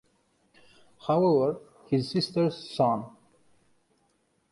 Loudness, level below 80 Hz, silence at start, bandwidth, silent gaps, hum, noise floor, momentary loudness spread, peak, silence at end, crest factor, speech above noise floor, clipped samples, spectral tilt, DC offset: -27 LUFS; -68 dBFS; 1.05 s; 11.5 kHz; none; none; -71 dBFS; 14 LU; -12 dBFS; 1.4 s; 18 dB; 45 dB; under 0.1%; -7.5 dB/octave; under 0.1%